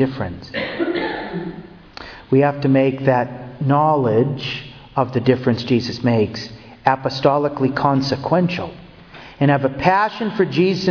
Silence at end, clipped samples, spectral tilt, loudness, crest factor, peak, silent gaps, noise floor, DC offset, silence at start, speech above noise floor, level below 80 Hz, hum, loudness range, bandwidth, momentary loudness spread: 0 s; under 0.1%; -7.5 dB/octave; -19 LUFS; 18 dB; 0 dBFS; none; -40 dBFS; under 0.1%; 0 s; 23 dB; -50 dBFS; none; 2 LU; 5.4 kHz; 14 LU